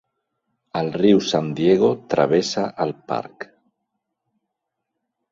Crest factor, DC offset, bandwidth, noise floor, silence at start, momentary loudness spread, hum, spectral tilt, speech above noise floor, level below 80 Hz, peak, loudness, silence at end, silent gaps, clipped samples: 20 dB; under 0.1%; 7.8 kHz; -80 dBFS; 0.75 s; 13 LU; none; -6 dB/octave; 61 dB; -62 dBFS; -4 dBFS; -20 LUFS; 1.9 s; none; under 0.1%